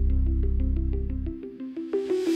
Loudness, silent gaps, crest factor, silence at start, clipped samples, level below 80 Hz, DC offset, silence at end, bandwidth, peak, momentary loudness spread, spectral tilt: -29 LUFS; none; 12 dB; 0 s; under 0.1%; -26 dBFS; under 0.1%; 0 s; 8 kHz; -14 dBFS; 10 LU; -8.5 dB/octave